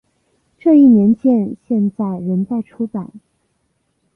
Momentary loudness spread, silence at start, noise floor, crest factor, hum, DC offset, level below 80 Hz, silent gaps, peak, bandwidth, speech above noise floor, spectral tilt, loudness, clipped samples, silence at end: 15 LU; 0.65 s; -66 dBFS; 14 dB; none; under 0.1%; -58 dBFS; none; -2 dBFS; 3.1 kHz; 52 dB; -12 dB/octave; -15 LUFS; under 0.1%; 1 s